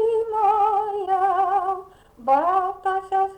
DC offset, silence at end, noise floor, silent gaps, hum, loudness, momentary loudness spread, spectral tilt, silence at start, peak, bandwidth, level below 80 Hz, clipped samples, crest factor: under 0.1%; 0 s; -41 dBFS; none; none; -22 LUFS; 7 LU; -5 dB/octave; 0 s; -8 dBFS; 9.6 kHz; -58 dBFS; under 0.1%; 12 dB